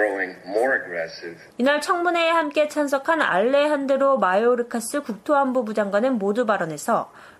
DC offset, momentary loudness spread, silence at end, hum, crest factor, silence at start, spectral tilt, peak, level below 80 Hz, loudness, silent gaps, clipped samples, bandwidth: under 0.1%; 9 LU; 0.1 s; none; 16 dB; 0 s; -4 dB/octave; -6 dBFS; -70 dBFS; -21 LUFS; none; under 0.1%; 15 kHz